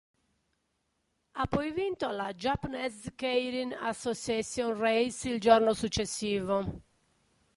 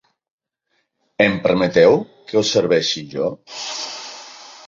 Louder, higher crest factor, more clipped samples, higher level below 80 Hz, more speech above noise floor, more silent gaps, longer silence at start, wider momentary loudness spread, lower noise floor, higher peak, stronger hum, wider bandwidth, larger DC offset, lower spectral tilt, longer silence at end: second, -31 LUFS vs -18 LUFS; first, 24 dB vs 18 dB; neither; about the same, -54 dBFS vs -56 dBFS; second, 48 dB vs 53 dB; neither; first, 1.35 s vs 1.2 s; second, 12 LU vs 19 LU; first, -78 dBFS vs -70 dBFS; second, -8 dBFS vs -2 dBFS; neither; first, 11.5 kHz vs 7.6 kHz; neither; about the same, -4.5 dB/octave vs -4 dB/octave; first, 0.75 s vs 0.15 s